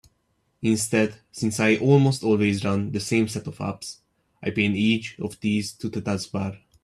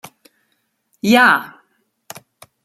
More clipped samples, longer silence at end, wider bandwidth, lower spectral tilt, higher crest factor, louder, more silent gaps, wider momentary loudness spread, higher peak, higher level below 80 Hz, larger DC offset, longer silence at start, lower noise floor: neither; second, 0.25 s vs 1.15 s; second, 14 kHz vs 15.5 kHz; first, -5.5 dB/octave vs -4 dB/octave; about the same, 20 dB vs 20 dB; second, -24 LUFS vs -14 LUFS; neither; second, 13 LU vs 27 LU; second, -4 dBFS vs 0 dBFS; about the same, -60 dBFS vs -64 dBFS; neither; second, 0.6 s vs 1.05 s; about the same, -70 dBFS vs -68 dBFS